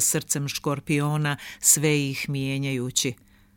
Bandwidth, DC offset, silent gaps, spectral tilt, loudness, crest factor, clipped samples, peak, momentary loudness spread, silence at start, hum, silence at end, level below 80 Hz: 17 kHz; under 0.1%; none; -3.5 dB/octave; -24 LUFS; 22 dB; under 0.1%; -4 dBFS; 9 LU; 0 s; none; 0.45 s; -58 dBFS